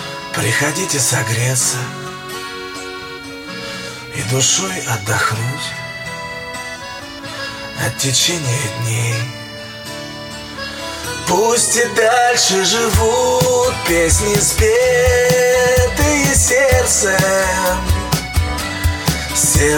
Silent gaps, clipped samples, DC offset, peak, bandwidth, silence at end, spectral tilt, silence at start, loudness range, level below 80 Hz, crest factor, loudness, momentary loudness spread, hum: none; under 0.1%; under 0.1%; 0 dBFS; 17.5 kHz; 0 s; -3 dB/octave; 0 s; 8 LU; -30 dBFS; 16 dB; -15 LUFS; 15 LU; none